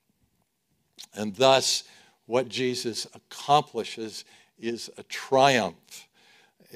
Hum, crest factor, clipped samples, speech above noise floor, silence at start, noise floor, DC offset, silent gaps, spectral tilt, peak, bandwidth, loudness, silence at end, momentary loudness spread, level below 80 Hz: none; 24 dB; under 0.1%; 48 dB; 1 s; -74 dBFS; under 0.1%; none; -3 dB/octave; -4 dBFS; 16 kHz; -26 LUFS; 0.75 s; 19 LU; -72 dBFS